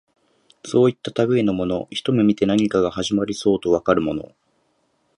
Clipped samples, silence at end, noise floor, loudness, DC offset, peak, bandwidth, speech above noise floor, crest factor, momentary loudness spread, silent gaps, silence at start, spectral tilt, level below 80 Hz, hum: under 0.1%; 0.9 s; -66 dBFS; -20 LUFS; under 0.1%; -2 dBFS; 11 kHz; 47 dB; 20 dB; 6 LU; none; 0.65 s; -6 dB/octave; -52 dBFS; none